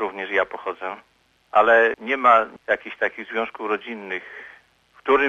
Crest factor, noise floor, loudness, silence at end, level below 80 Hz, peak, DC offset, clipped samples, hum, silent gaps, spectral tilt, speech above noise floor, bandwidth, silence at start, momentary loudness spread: 18 dB; -55 dBFS; -21 LUFS; 0 s; -60 dBFS; -4 dBFS; under 0.1%; under 0.1%; 50 Hz at -75 dBFS; none; -4.5 dB/octave; 33 dB; 9.2 kHz; 0 s; 16 LU